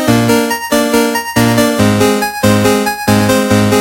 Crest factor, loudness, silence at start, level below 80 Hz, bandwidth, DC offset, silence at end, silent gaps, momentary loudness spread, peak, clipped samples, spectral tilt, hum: 10 dB; -11 LUFS; 0 s; -38 dBFS; 17 kHz; under 0.1%; 0 s; none; 3 LU; 0 dBFS; under 0.1%; -5 dB/octave; none